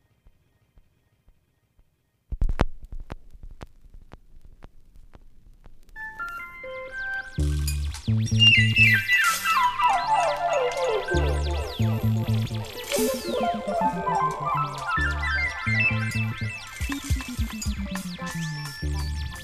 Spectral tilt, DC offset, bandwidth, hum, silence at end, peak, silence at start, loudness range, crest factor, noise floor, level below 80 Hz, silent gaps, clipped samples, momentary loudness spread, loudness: -4.5 dB/octave; under 0.1%; 15.5 kHz; none; 0 s; -2 dBFS; 2.3 s; 17 LU; 24 dB; -65 dBFS; -34 dBFS; none; under 0.1%; 16 LU; -24 LUFS